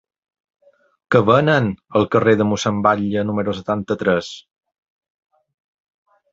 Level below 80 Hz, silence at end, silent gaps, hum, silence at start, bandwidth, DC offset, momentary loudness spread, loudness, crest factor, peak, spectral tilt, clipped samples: -52 dBFS; 1.9 s; none; none; 1.1 s; 8 kHz; under 0.1%; 8 LU; -18 LUFS; 20 dB; 0 dBFS; -6.5 dB/octave; under 0.1%